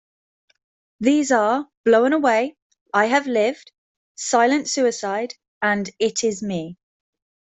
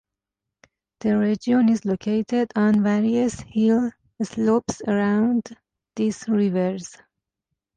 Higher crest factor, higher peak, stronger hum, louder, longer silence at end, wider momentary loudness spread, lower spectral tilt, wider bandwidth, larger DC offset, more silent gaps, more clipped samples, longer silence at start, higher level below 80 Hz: first, 18 dB vs 12 dB; first, -4 dBFS vs -10 dBFS; neither; about the same, -20 LUFS vs -22 LUFS; second, 0.65 s vs 0.9 s; about the same, 11 LU vs 10 LU; second, -3.5 dB/octave vs -6.5 dB/octave; second, 8.4 kHz vs 9.4 kHz; neither; first, 1.77-1.84 s, 2.62-2.70 s, 2.81-2.86 s, 3.78-4.15 s, 5.48-5.61 s vs none; neither; about the same, 1 s vs 1.05 s; second, -66 dBFS vs -58 dBFS